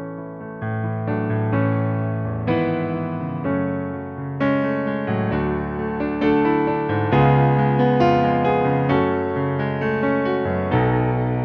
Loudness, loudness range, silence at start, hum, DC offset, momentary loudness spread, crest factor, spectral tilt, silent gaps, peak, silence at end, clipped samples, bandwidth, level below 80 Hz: -21 LUFS; 5 LU; 0 s; none; under 0.1%; 9 LU; 16 dB; -10 dB/octave; none; -4 dBFS; 0 s; under 0.1%; 5.8 kHz; -44 dBFS